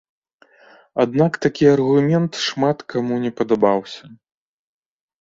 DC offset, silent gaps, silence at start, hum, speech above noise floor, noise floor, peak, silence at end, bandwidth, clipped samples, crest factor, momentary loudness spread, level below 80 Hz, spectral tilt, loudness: under 0.1%; none; 0.95 s; none; 34 dB; -52 dBFS; -2 dBFS; 1.05 s; 7.8 kHz; under 0.1%; 18 dB; 8 LU; -58 dBFS; -6.5 dB/octave; -18 LUFS